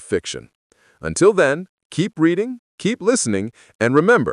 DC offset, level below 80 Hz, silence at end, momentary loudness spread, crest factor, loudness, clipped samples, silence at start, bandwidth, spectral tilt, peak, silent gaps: under 0.1%; -52 dBFS; 0 s; 15 LU; 16 dB; -19 LUFS; under 0.1%; 0 s; 11 kHz; -5 dB/octave; -2 dBFS; 0.55-0.70 s, 1.69-1.77 s, 1.85-1.90 s, 2.59-2.78 s, 3.75-3.79 s